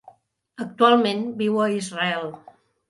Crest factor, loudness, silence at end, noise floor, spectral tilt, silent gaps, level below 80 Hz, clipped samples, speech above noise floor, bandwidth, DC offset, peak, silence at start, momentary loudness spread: 20 dB; -21 LUFS; 0.5 s; -53 dBFS; -5 dB/octave; none; -72 dBFS; under 0.1%; 31 dB; 11.5 kHz; under 0.1%; -2 dBFS; 0.6 s; 18 LU